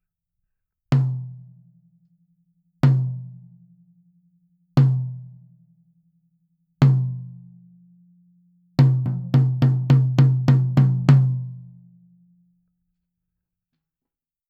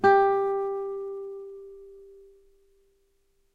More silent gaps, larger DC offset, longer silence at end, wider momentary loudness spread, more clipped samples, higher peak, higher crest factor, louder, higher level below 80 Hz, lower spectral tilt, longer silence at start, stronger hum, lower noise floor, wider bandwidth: neither; neither; first, 2.85 s vs 1.5 s; second, 19 LU vs 26 LU; neither; first, -2 dBFS vs -8 dBFS; about the same, 20 dB vs 20 dB; first, -20 LUFS vs -27 LUFS; first, -58 dBFS vs -64 dBFS; first, -9.5 dB/octave vs -6.5 dB/octave; first, 0.9 s vs 0 s; neither; first, -88 dBFS vs -68 dBFS; first, 5.6 kHz vs 5 kHz